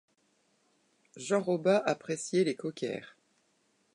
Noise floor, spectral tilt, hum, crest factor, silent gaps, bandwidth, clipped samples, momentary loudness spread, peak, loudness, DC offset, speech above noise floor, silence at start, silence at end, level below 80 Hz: -73 dBFS; -5 dB/octave; none; 20 dB; none; 11 kHz; under 0.1%; 10 LU; -14 dBFS; -31 LUFS; under 0.1%; 42 dB; 1.15 s; 0.9 s; -84 dBFS